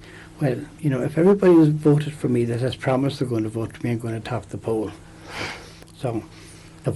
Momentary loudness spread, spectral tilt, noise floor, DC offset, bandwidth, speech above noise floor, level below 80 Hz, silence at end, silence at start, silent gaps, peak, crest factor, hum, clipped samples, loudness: 17 LU; -7.5 dB/octave; -41 dBFS; under 0.1%; 12 kHz; 20 dB; -52 dBFS; 0 s; 0 s; none; -8 dBFS; 14 dB; none; under 0.1%; -22 LUFS